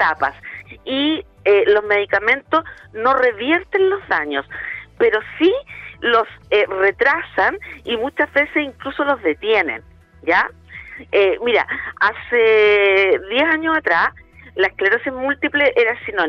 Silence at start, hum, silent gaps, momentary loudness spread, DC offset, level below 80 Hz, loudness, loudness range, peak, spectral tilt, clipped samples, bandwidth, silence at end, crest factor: 0 s; none; none; 11 LU; under 0.1%; -50 dBFS; -17 LUFS; 3 LU; -4 dBFS; -5.5 dB/octave; under 0.1%; 6.4 kHz; 0 s; 12 dB